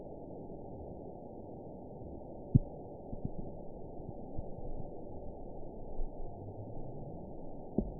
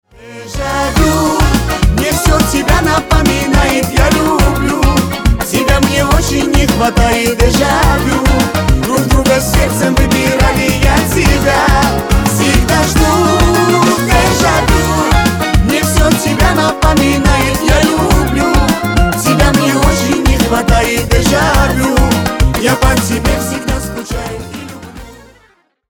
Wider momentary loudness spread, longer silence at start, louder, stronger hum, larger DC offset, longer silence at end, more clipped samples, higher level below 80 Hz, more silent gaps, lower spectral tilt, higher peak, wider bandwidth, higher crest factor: first, 11 LU vs 4 LU; second, 0 s vs 0.2 s; second, -43 LUFS vs -11 LUFS; neither; first, 0.2% vs under 0.1%; second, 0 s vs 0.75 s; neither; second, -46 dBFS vs -16 dBFS; neither; first, -7 dB/octave vs -4.5 dB/octave; second, -10 dBFS vs 0 dBFS; second, 1 kHz vs over 20 kHz; first, 30 dB vs 10 dB